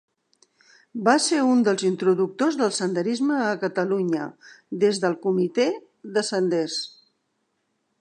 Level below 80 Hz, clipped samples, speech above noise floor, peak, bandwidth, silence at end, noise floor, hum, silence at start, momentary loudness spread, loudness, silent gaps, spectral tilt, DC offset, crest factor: -78 dBFS; under 0.1%; 51 dB; -2 dBFS; 10.5 kHz; 1.1 s; -74 dBFS; none; 0.95 s; 9 LU; -23 LUFS; none; -4.5 dB/octave; under 0.1%; 20 dB